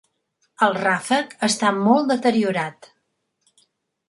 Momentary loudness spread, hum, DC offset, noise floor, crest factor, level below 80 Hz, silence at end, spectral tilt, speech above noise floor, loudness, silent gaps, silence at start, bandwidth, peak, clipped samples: 6 LU; none; under 0.1%; -73 dBFS; 18 dB; -70 dBFS; 1.35 s; -4 dB/octave; 53 dB; -20 LUFS; none; 0.6 s; 11.5 kHz; -4 dBFS; under 0.1%